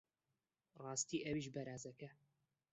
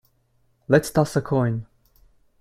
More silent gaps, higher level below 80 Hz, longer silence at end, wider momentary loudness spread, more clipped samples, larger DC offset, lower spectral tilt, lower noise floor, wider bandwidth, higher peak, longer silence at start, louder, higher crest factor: neither; second, -78 dBFS vs -52 dBFS; second, 0.6 s vs 0.75 s; first, 15 LU vs 7 LU; neither; neither; second, -4 dB/octave vs -6.5 dB/octave; first, under -90 dBFS vs -65 dBFS; second, 8.2 kHz vs 16 kHz; second, -28 dBFS vs -2 dBFS; about the same, 0.75 s vs 0.7 s; second, -45 LUFS vs -22 LUFS; about the same, 20 dB vs 22 dB